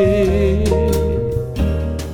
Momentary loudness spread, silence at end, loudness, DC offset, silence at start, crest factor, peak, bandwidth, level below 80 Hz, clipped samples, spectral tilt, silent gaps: 6 LU; 0 s; -18 LUFS; under 0.1%; 0 s; 12 dB; -4 dBFS; 17.5 kHz; -22 dBFS; under 0.1%; -7.5 dB/octave; none